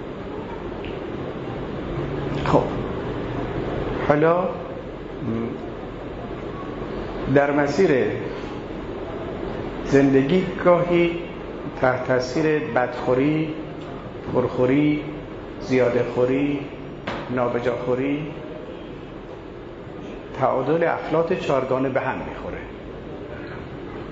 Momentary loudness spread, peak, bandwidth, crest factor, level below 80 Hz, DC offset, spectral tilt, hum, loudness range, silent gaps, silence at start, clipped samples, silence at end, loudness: 16 LU; -2 dBFS; 7.8 kHz; 22 dB; -42 dBFS; under 0.1%; -7.5 dB/octave; none; 5 LU; none; 0 s; under 0.1%; 0 s; -23 LUFS